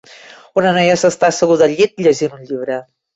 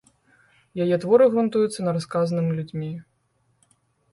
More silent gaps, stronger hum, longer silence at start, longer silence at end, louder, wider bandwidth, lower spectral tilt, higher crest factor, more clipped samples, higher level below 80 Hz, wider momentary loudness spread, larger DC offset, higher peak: neither; neither; second, 0.55 s vs 0.75 s; second, 0.35 s vs 1.1 s; first, -14 LUFS vs -22 LUFS; second, 8.2 kHz vs 11.5 kHz; second, -4.5 dB/octave vs -7.5 dB/octave; second, 14 dB vs 20 dB; neither; first, -58 dBFS vs -66 dBFS; second, 11 LU vs 16 LU; neither; about the same, -2 dBFS vs -4 dBFS